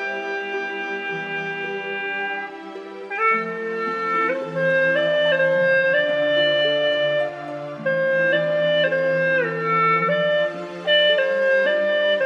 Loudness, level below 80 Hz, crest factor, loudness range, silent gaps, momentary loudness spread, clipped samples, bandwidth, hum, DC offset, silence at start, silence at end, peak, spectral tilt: -20 LUFS; -76 dBFS; 14 dB; 6 LU; none; 9 LU; under 0.1%; 7.4 kHz; none; under 0.1%; 0 s; 0 s; -8 dBFS; -5 dB/octave